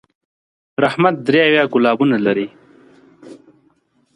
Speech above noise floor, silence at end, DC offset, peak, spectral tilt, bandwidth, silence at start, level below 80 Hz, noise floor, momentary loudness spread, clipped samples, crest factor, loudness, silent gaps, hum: 45 dB; 0.85 s; under 0.1%; 0 dBFS; -7 dB/octave; 10.5 kHz; 0.8 s; -64 dBFS; -59 dBFS; 9 LU; under 0.1%; 18 dB; -15 LUFS; none; none